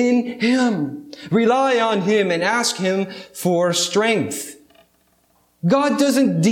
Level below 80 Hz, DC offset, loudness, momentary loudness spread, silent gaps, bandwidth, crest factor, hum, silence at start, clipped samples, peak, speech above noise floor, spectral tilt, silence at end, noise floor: -68 dBFS; under 0.1%; -19 LUFS; 9 LU; none; 17.5 kHz; 14 dB; none; 0 s; under 0.1%; -4 dBFS; 42 dB; -4.5 dB/octave; 0 s; -61 dBFS